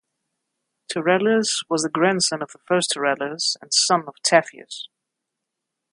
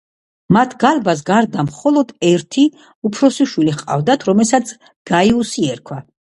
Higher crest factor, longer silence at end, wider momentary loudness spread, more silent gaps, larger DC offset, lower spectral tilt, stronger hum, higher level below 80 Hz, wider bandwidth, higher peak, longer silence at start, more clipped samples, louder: first, 22 dB vs 16 dB; first, 1.05 s vs 0.35 s; first, 16 LU vs 8 LU; second, none vs 2.95-3.02 s, 4.96-5.05 s; neither; second, -2.5 dB/octave vs -5.5 dB/octave; neither; second, -74 dBFS vs -52 dBFS; about the same, 11.5 kHz vs 11.5 kHz; about the same, 0 dBFS vs 0 dBFS; first, 0.9 s vs 0.5 s; neither; second, -20 LUFS vs -15 LUFS